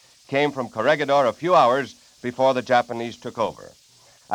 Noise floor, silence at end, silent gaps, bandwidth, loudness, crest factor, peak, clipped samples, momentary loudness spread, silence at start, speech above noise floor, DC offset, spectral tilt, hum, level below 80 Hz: -53 dBFS; 0 s; none; 13.5 kHz; -21 LUFS; 18 dB; -4 dBFS; under 0.1%; 14 LU; 0.3 s; 32 dB; under 0.1%; -5 dB/octave; none; -66 dBFS